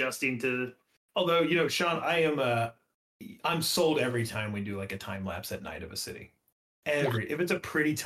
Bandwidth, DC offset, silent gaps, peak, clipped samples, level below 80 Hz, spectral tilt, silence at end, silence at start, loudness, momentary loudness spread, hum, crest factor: 16.5 kHz; under 0.1%; 0.97-1.09 s, 2.94-3.20 s, 6.52-6.83 s; -16 dBFS; under 0.1%; -64 dBFS; -4.5 dB/octave; 0 s; 0 s; -30 LUFS; 12 LU; none; 16 dB